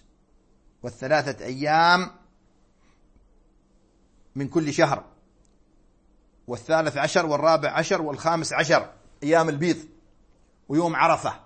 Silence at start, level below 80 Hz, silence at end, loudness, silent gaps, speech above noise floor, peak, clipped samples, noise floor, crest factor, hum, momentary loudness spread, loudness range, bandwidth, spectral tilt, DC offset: 0.85 s; -60 dBFS; 0.05 s; -23 LUFS; none; 38 dB; -4 dBFS; under 0.1%; -61 dBFS; 22 dB; none; 15 LU; 7 LU; 8.8 kHz; -4.5 dB/octave; under 0.1%